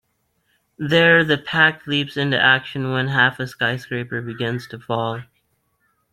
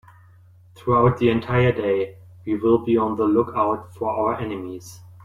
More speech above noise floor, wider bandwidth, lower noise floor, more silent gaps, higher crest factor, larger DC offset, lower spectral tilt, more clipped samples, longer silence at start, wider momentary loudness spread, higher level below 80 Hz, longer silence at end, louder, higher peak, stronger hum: first, 49 dB vs 29 dB; about the same, 14 kHz vs 13 kHz; first, -68 dBFS vs -50 dBFS; neither; about the same, 20 dB vs 16 dB; neither; second, -6 dB/octave vs -8 dB/octave; neither; about the same, 0.8 s vs 0.8 s; about the same, 13 LU vs 14 LU; second, -60 dBFS vs -50 dBFS; first, 0.9 s vs 0.1 s; about the same, -19 LUFS vs -21 LUFS; first, -2 dBFS vs -6 dBFS; neither